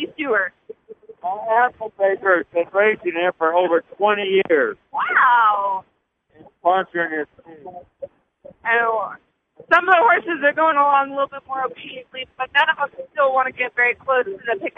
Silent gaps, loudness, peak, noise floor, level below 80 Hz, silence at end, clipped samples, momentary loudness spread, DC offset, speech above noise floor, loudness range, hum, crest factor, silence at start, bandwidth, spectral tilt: none; -19 LUFS; -2 dBFS; -59 dBFS; -68 dBFS; 0.1 s; under 0.1%; 16 LU; under 0.1%; 40 dB; 6 LU; none; 18 dB; 0 s; 6.8 kHz; -5.5 dB/octave